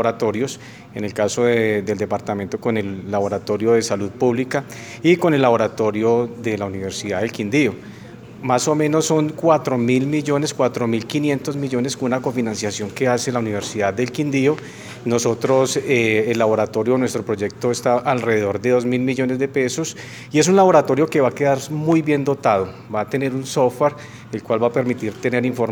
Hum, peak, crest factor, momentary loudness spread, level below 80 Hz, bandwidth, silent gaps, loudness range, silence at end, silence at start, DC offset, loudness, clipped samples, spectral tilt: none; 0 dBFS; 18 dB; 8 LU; -60 dBFS; over 20 kHz; none; 4 LU; 0 s; 0 s; under 0.1%; -19 LUFS; under 0.1%; -5.5 dB/octave